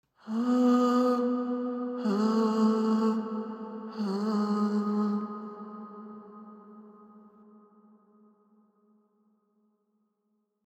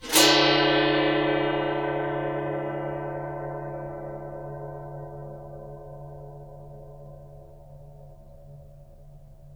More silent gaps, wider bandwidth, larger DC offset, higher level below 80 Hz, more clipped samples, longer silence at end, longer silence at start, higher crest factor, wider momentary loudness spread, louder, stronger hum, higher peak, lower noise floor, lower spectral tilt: neither; second, 8.6 kHz vs over 20 kHz; neither; second, -88 dBFS vs -50 dBFS; neither; first, 3.45 s vs 0 s; first, 0.25 s vs 0 s; second, 16 dB vs 24 dB; second, 21 LU vs 25 LU; second, -28 LUFS vs -24 LUFS; neither; second, -16 dBFS vs -4 dBFS; first, -77 dBFS vs -47 dBFS; first, -7.5 dB/octave vs -3.5 dB/octave